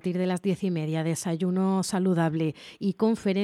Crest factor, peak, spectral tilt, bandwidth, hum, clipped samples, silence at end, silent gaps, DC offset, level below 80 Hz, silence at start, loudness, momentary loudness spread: 14 dB; -12 dBFS; -6.5 dB/octave; 13 kHz; none; under 0.1%; 0 s; none; under 0.1%; -68 dBFS; 0.05 s; -27 LUFS; 5 LU